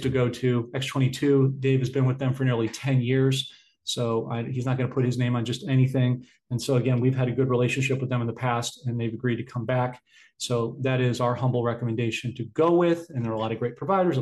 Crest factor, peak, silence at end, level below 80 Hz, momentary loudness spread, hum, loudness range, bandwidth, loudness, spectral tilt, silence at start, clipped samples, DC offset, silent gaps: 14 dB; -10 dBFS; 0 s; -60 dBFS; 8 LU; none; 3 LU; 12.5 kHz; -25 LUFS; -6.5 dB/octave; 0 s; under 0.1%; under 0.1%; none